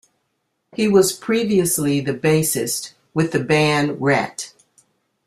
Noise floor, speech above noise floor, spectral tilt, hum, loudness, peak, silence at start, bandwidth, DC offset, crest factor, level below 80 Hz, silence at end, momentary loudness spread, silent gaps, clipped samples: -72 dBFS; 54 dB; -4.5 dB/octave; none; -19 LUFS; -2 dBFS; 0.75 s; 15.5 kHz; under 0.1%; 18 dB; -56 dBFS; 0.8 s; 11 LU; none; under 0.1%